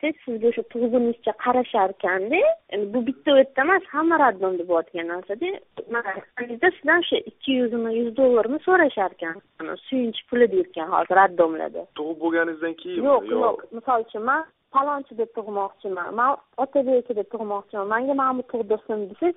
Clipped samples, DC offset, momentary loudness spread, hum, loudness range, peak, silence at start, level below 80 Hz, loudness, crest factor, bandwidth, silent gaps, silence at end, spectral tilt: under 0.1%; under 0.1%; 11 LU; none; 4 LU; -4 dBFS; 0.05 s; -66 dBFS; -23 LUFS; 18 dB; 4 kHz; none; 0.05 s; -2 dB/octave